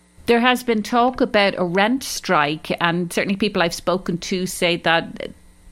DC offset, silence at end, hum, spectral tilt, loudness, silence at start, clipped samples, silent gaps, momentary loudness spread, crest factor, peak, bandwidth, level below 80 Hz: under 0.1%; 0 s; none; -4 dB/octave; -19 LUFS; 0.25 s; under 0.1%; none; 7 LU; 20 dB; 0 dBFS; 16.5 kHz; -48 dBFS